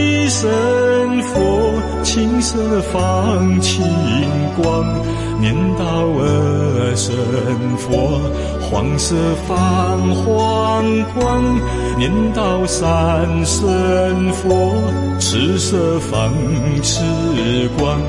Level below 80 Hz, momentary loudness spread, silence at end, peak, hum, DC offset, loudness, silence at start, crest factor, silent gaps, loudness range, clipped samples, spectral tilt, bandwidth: -30 dBFS; 3 LU; 0 s; -4 dBFS; none; under 0.1%; -16 LUFS; 0 s; 12 dB; none; 1 LU; under 0.1%; -5.5 dB/octave; 11.5 kHz